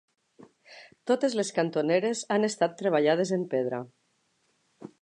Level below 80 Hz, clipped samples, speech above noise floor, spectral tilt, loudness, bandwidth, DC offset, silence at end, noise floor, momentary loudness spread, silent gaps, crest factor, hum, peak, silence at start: -82 dBFS; under 0.1%; 45 dB; -5 dB/octave; -27 LUFS; 11 kHz; under 0.1%; 0.15 s; -72 dBFS; 8 LU; none; 18 dB; none; -10 dBFS; 0.7 s